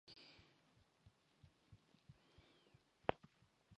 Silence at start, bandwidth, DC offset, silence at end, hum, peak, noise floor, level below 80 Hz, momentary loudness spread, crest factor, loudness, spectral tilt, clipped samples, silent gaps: 0.05 s; 10 kHz; under 0.1%; 0.05 s; none; -16 dBFS; -76 dBFS; -76 dBFS; 23 LU; 40 dB; -48 LUFS; -6 dB/octave; under 0.1%; none